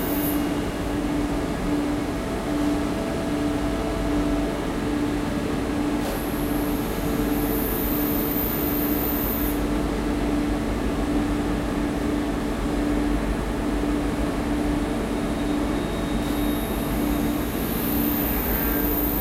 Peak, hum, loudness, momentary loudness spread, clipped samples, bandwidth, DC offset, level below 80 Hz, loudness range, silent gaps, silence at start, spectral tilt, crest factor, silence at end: -10 dBFS; none; -25 LUFS; 3 LU; under 0.1%; 16 kHz; under 0.1%; -32 dBFS; 2 LU; none; 0 s; -6 dB/octave; 14 dB; 0 s